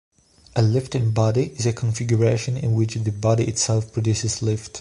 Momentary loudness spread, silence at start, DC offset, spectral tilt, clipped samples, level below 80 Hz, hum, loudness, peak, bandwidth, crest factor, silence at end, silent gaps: 4 LU; 0.55 s; under 0.1%; -5.5 dB/octave; under 0.1%; -46 dBFS; none; -22 LUFS; -6 dBFS; 11.5 kHz; 16 dB; 0 s; none